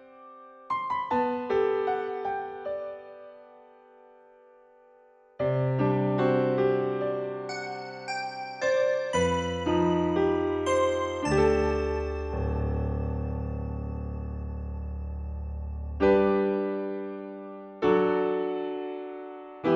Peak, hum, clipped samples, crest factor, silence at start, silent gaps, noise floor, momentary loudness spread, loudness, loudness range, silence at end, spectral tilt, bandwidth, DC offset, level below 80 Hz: -10 dBFS; none; under 0.1%; 18 dB; 0 s; none; -58 dBFS; 13 LU; -28 LUFS; 7 LU; 0 s; -6.5 dB/octave; 10.5 kHz; under 0.1%; -40 dBFS